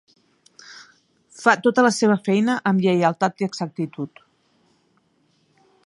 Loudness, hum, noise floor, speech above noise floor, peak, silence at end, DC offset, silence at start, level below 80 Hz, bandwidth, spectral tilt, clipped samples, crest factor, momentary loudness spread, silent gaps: -20 LUFS; none; -64 dBFS; 45 dB; -2 dBFS; 1.8 s; under 0.1%; 0.7 s; -72 dBFS; 11.5 kHz; -5.5 dB/octave; under 0.1%; 22 dB; 17 LU; none